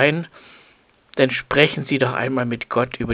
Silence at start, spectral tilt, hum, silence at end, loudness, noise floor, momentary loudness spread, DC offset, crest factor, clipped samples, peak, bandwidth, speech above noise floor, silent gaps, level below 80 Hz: 0 s; -9.5 dB/octave; none; 0 s; -20 LUFS; -56 dBFS; 10 LU; under 0.1%; 20 dB; under 0.1%; 0 dBFS; 4 kHz; 36 dB; none; -46 dBFS